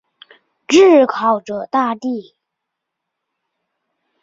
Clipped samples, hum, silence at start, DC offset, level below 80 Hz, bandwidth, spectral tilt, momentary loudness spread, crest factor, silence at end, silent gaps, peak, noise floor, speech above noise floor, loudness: under 0.1%; none; 0.7 s; under 0.1%; -64 dBFS; 7.8 kHz; -4 dB/octave; 14 LU; 16 dB; 2 s; none; -2 dBFS; -79 dBFS; 65 dB; -14 LUFS